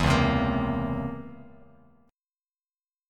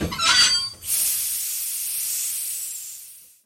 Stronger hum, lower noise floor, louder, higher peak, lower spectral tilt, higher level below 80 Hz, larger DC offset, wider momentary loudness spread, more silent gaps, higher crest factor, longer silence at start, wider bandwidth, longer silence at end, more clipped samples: neither; first, under -90 dBFS vs -44 dBFS; second, -27 LUFS vs -20 LUFS; second, -8 dBFS vs -4 dBFS; first, -6.5 dB/octave vs 0.5 dB/octave; first, -40 dBFS vs -48 dBFS; neither; about the same, 17 LU vs 15 LU; neither; about the same, 20 dB vs 20 dB; about the same, 0 s vs 0 s; second, 13 kHz vs 17 kHz; first, 1.6 s vs 0.2 s; neither